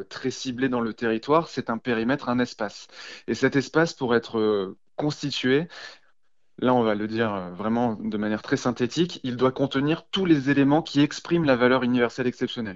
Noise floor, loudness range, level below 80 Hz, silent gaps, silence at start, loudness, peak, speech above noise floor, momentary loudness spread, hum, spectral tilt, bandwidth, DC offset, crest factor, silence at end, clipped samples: -74 dBFS; 4 LU; -58 dBFS; none; 0 s; -24 LUFS; -6 dBFS; 49 dB; 9 LU; none; -6 dB/octave; 7.8 kHz; 0.1%; 20 dB; 0 s; under 0.1%